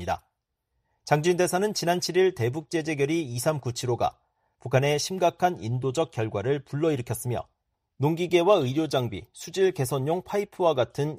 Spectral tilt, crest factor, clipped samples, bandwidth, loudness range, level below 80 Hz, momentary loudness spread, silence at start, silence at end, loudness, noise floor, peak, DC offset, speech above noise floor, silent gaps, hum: -5.5 dB/octave; 20 dB; under 0.1%; 15.5 kHz; 2 LU; -60 dBFS; 8 LU; 0 s; 0 s; -26 LUFS; -79 dBFS; -8 dBFS; under 0.1%; 53 dB; none; none